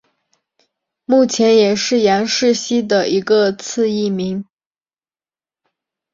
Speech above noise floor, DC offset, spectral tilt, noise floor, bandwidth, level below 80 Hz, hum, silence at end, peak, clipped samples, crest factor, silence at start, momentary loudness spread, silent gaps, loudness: over 75 dB; under 0.1%; -4 dB/octave; under -90 dBFS; 7.8 kHz; -60 dBFS; none; 1.7 s; -2 dBFS; under 0.1%; 14 dB; 1.1 s; 8 LU; none; -15 LUFS